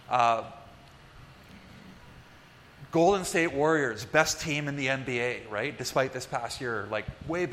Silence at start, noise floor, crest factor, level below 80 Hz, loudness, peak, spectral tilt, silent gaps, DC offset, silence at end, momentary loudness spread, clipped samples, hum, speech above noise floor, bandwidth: 0.1 s; -53 dBFS; 24 dB; -56 dBFS; -28 LUFS; -6 dBFS; -4 dB/octave; none; under 0.1%; 0 s; 10 LU; under 0.1%; none; 25 dB; 16 kHz